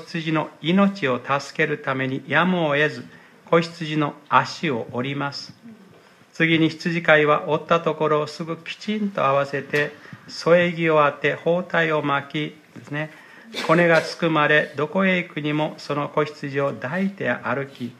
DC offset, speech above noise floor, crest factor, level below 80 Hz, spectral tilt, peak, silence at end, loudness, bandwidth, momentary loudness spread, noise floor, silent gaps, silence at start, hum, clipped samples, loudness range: under 0.1%; 29 dB; 22 dB; -72 dBFS; -6 dB/octave; 0 dBFS; 0.05 s; -21 LUFS; 13 kHz; 11 LU; -51 dBFS; none; 0 s; none; under 0.1%; 3 LU